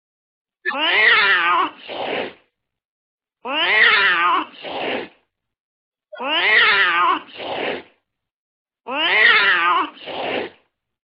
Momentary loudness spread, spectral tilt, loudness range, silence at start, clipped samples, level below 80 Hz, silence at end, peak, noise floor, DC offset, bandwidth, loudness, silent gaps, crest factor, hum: 16 LU; -5 dB/octave; 2 LU; 0.65 s; under 0.1%; -72 dBFS; 0.55 s; 0 dBFS; -69 dBFS; under 0.1%; 5.6 kHz; -16 LUFS; 2.85-3.18 s, 5.60-5.92 s, 8.34-8.65 s; 20 dB; none